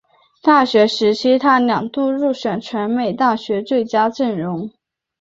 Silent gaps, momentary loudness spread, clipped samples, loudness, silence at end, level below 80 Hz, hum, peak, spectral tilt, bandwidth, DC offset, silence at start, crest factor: none; 9 LU; under 0.1%; -17 LUFS; 0.5 s; -62 dBFS; none; -2 dBFS; -5.5 dB/octave; 7.8 kHz; under 0.1%; 0.45 s; 16 dB